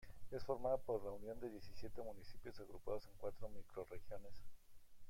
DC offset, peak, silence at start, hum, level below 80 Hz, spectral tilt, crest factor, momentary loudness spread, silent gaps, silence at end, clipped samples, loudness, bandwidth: under 0.1%; -28 dBFS; 0 s; none; -60 dBFS; -6.5 dB/octave; 18 dB; 15 LU; none; 0 s; under 0.1%; -49 LUFS; 16.5 kHz